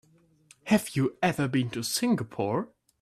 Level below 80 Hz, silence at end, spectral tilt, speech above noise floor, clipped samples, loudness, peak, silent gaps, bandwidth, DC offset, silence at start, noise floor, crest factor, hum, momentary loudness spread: -64 dBFS; 0.35 s; -5 dB/octave; 33 dB; under 0.1%; -28 LUFS; -10 dBFS; none; 16 kHz; under 0.1%; 0.65 s; -60 dBFS; 18 dB; none; 6 LU